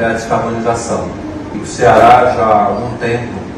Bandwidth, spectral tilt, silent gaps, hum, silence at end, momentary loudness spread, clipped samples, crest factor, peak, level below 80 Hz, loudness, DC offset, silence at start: 12 kHz; -5.5 dB/octave; none; none; 0 s; 16 LU; 0.4%; 12 dB; 0 dBFS; -36 dBFS; -12 LUFS; under 0.1%; 0 s